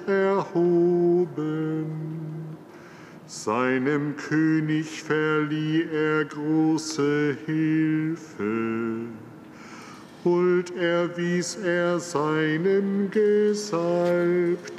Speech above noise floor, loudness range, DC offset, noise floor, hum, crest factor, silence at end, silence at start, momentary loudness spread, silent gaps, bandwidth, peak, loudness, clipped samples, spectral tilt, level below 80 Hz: 21 dB; 4 LU; under 0.1%; -45 dBFS; none; 12 dB; 0 s; 0 s; 16 LU; none; 12 kHz; -12 dBFS; -24 LUFS; under 0.1%; -6 dB/octave; -76 dBFS